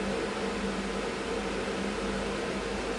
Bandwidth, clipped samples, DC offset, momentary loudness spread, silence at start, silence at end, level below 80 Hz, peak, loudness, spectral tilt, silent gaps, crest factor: 11.5 kHz; under 0.1%; under 0.1%; 1 LU; 0 s; 0 s; -46 dBFS; -20 dBFS; -32 LUFS; -4.5 dB/octave; none; 12 dB